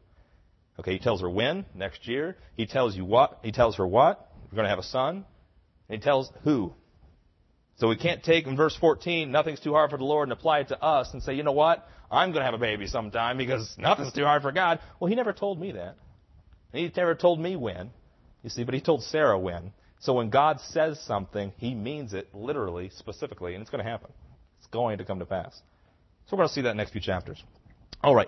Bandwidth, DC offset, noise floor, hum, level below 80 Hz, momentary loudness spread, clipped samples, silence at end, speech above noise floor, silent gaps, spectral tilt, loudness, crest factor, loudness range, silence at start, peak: 6.2 kHz; under 0.1%; -65 dBFS; none; -54 dBFS; 14 LU; under 0.1%; 0 s; 38 dB; none; -6 dB/octave; -27 LUFS; 20 dB; 8 LU; 0.8 s; -8 dBFS